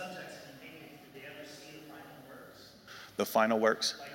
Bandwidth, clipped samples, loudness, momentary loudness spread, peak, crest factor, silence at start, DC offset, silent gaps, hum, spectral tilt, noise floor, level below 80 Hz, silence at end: 16 kHz; under 0.1%; -31 LUFS; 23 LU; -14 dBFS; 22 dB; 0 s; under 0.1%; none; none; -3 dB/octave; -54 dBFS; -76 dBFS; 0 s